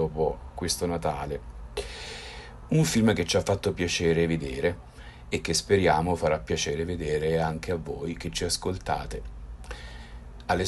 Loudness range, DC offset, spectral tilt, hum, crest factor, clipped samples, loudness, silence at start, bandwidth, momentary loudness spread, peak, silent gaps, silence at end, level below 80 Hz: 4 LU; under 0.1%; -4.5 dB/octave; none; 18 dB; under 0.1%; -27 LUFS; 0 s; 12.5 kHz; 18 LU; -10 dBFS; none; 0 s; -42 dBFS